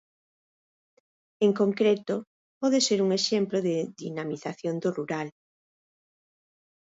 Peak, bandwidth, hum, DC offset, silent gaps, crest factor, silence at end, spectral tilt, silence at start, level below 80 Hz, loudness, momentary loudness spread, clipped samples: -10 dBFS; 8 kHz; none; under 0.1%; 2.27-2.61 s; 18 dB; 1.55 s; -4.5 dB/octave; 1.4 s; -76 dBFS; -27 LUFS; 11 LU; under 0.1%